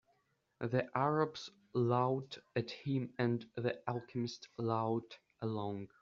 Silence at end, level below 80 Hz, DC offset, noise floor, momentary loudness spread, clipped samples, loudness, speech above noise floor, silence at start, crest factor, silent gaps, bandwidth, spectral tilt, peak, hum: 0.15 s; -76 dBFS; under 0.1%; -78 dBFS; 9 LU; under 0.1%; -38 LUFS; 41 dB; 0.6 s; 20 dB; none; 7.4 kHz; -6 dB/octave; -18 dBFS; none